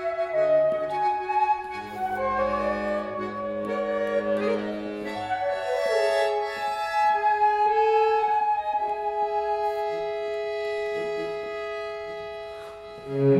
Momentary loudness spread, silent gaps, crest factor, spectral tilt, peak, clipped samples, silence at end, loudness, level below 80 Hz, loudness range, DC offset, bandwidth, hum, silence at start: 11 LU; none; 14 dB; -6 dB/octave; -12 dBFS; under 0.1%; 0 s; -26 LUFS; -58 dBFS; 6 LU; under 0.1%; 13 kHz; none; 0 s